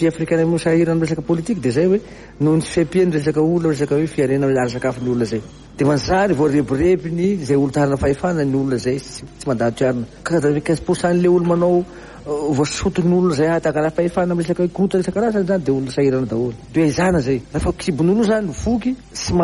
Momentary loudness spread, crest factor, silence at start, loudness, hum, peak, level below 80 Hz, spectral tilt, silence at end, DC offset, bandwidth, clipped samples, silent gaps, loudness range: 6 LU; 14 dB; 0 s; -18 LUFS; none; -4 dBFS; -40 dBFS; -6.5 dB/octave; 0 s; under 0.1%; 11.5 kHz; under 0.1%; none; 1 LU